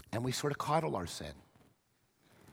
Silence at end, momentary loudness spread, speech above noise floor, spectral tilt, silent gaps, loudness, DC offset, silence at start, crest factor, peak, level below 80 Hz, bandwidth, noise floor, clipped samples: 0 s; 11 LU; 39 dB; -5 dB/octave; none; -36 LUFS; under 0.1%; 0.1 s; 20 dB; -18 dBFS; -64 dBFS; 17 kHz; -75 dBFS; under 0.1%